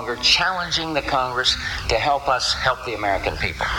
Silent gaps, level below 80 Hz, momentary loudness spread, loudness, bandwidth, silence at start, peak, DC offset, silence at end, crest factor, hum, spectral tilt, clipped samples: none; -38 dBFS; 7 LU; -20 LUFS; 17 kHz; 0 s; -4 dBFS; under 0.1%; 0 s; 18 dB; none; -2.5 dB/octave; under 0.1%